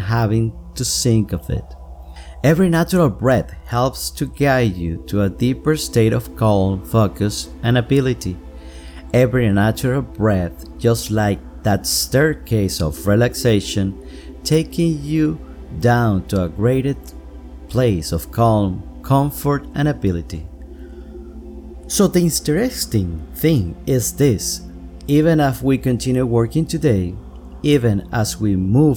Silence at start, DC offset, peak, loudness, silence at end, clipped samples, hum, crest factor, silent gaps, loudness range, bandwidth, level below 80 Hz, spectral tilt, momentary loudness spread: 0 s; under 0.1%; -2 dBFS; -18 LUFS; 0 s; under 0.1%; none; 16 dB; none; 2 LU; 20 kHz; -34 dBFS; -6 dB/octave; 19 LU